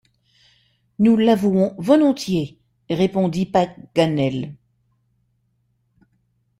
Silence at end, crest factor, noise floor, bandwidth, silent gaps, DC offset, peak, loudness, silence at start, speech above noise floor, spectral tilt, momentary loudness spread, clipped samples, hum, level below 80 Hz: 2.05 s; 20 dB; -67 dBFS; 15.5 kHz; none; under 0.1%; -2 dBFS; -19 LUFS; 1 s; 49 dB; -7 dB/octave; 10 LU; under 0.1%; none; -58 dBFS